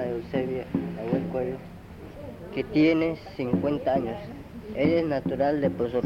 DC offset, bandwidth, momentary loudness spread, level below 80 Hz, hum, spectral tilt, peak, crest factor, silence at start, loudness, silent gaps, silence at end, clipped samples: under 0.1%; 7 kHz; 18 LU; -52 dBFS; none; -8.5 dB/octave; -10 dBFS; 16 dB; 0 s; -27 LUFS; none; 0 s; under 0.1%